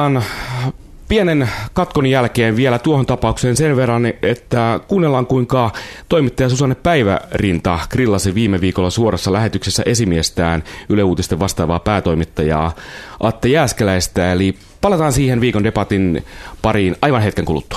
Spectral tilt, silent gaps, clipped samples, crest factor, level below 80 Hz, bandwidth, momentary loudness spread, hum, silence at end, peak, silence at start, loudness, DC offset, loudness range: -5.5 dB/octave; none; under 0.1%; 16 dB; -34 dBFS; 14 kHz; 6 LU; none; 0 s; 0 dBFS; 0 s; -16 LUFS; under 0.1%; 1 LU